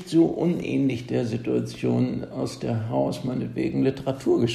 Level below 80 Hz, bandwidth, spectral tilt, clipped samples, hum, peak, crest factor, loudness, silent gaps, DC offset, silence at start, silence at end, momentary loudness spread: -54 dBFS; 13 kHz; -7.5 dB/octave; under 0.1%; none; -8 dBFS; 16 dB; -25 LUFS; none; under 0.1%; 0 s; 0 s; 7 LU